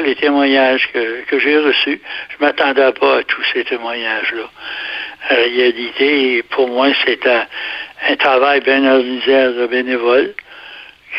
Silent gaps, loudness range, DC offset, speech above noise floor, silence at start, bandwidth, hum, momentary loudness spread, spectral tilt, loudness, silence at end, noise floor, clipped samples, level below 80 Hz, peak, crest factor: none; 3 LU; under 0.1%; 22 dB; 0 s; 5.8 kHz; none; 11 LU; -5 dB/octave; -14 LUFS; 0 s; -36 dBFS; under 0.1%; -58 dBFS; 0 dBFS; 14 dB